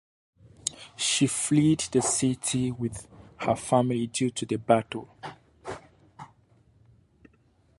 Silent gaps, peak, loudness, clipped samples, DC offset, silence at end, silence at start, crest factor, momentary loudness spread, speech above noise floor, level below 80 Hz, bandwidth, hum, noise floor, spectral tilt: none; -6 dBFS; -26 LUFS; under 0.1%; under 0.1%; 1.55 s; 0.65 s; 22 dB; 19 LU; 38 dB; -60 dBFS; 11.5 kHz; none; -63 dBFS; -4.5 dB/octave